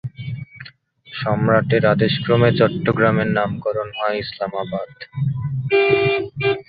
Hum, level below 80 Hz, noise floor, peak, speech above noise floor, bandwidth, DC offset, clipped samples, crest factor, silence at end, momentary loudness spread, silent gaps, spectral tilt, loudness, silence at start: none; -50 dBFS; -45 dBFS; -2 dBFS; 26 dB; 5 kHz; under 0.1%; under 0.1%; 18 dB; 0.05 s; 15 LU; none; -10.5 dB/octave; -19 LUFS; 0.05 s